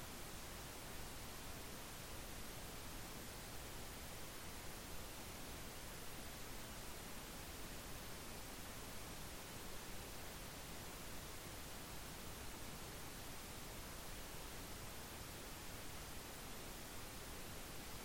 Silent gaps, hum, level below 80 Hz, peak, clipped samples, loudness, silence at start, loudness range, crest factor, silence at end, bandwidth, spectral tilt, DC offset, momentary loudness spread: none; none; -58 dBFS; -38 dBFS; under 0.1%; -51 LUFS; 0 s; 0 LU; 14 dB; 0 s; 16.5 kHz; -3 dB/octave; under 0.1%; 0 LU